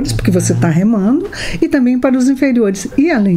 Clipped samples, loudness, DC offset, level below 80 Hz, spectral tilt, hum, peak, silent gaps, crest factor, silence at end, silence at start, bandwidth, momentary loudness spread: under 0.1%; -13 LUFS; under 0.1%; -32 dBFS; -6 dB/octave; none; 0 dBFS; none; 12 dB; 0 s; 0 s; 15 kHz; 3 LU